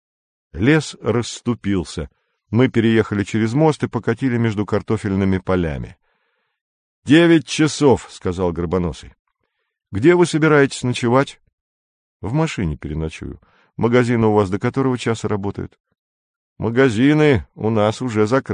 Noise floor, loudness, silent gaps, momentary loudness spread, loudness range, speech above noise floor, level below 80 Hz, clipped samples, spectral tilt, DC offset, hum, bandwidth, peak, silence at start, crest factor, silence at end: -73 dBFS; -18 LUFS; 6.61-7.02 s, 9.19-9.25 s, 11.53-12.20 s, 15.80-15.84 s, 15.99-16.56 s; 14 LU; 3 LU; 56 dB; -40 dBFS; under 0.1%; -6.5 dB/octave; under 0.1%; none; 10 kHz; -2 dBFS; 0.55 s; 18 dB; 0 s